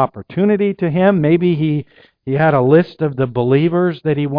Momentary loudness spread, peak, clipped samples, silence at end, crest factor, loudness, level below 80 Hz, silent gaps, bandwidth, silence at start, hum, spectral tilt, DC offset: 7 LU; 0 dBFS; under 0.1%; 0 s; 14 dB; -15 LUFS; -50 dBFS; none; 5.2 kHz; 0 s; none; -11 dB/octave; under 0.1%